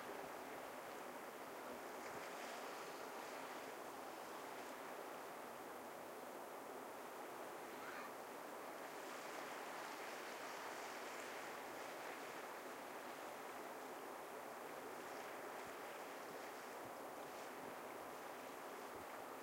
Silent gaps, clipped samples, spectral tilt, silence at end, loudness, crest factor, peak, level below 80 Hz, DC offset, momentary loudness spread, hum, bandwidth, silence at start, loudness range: none; under 0.1%; -2.5 dB/octave; 0 s; -51 LUFS; 14 dB; -38 dBFS; -90 dBFS; under 0.1%; 3 LU; none; 16 kHz; 0 s; 2 LU